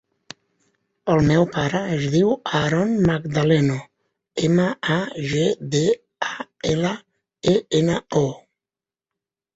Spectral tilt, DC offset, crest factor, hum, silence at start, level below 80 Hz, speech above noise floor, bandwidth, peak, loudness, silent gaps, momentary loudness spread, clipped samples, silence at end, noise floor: -6 dB/octave; under 0.1%; 16 dB; none; 1.05 s; -50 dBFS; over 70 dB; 8 kHz; -4 dBFS; -21 LUFS; none; 10 LU; under 0.1%; 1.2 s; under -90 dBFS